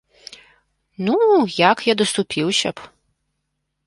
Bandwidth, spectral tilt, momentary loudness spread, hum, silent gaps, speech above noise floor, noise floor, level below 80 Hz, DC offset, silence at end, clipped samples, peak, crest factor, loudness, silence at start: 11.5 kHz; -4 dB/octave; 11 LU; none; none; 57 dB; -75 dBFS; -62 dBFS; under 0.1%; 1 s; under 0.1%; -2 dBFS; 20 dB; -18 LUFS; 1 s